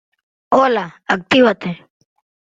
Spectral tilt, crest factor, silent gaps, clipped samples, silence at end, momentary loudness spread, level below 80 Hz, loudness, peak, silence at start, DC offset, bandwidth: -5.5 dB/octave; 18 dB; none; under 0.1%; 0.8 s; 13 LU; -58 dBFS; -15 LUFS; 0 dBFS; 0.5 s; under 0.1%; 7.8 kHz